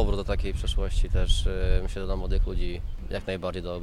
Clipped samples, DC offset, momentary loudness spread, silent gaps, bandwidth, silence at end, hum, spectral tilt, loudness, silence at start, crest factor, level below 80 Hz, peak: under 0.1%; under 0.1%; 7 LU; none; 11.5 kHz; 0 s; none; -5.5 dB/octave; -30 LUFS; 0 s; 16 dB; -26 dBFS; -8 dBFS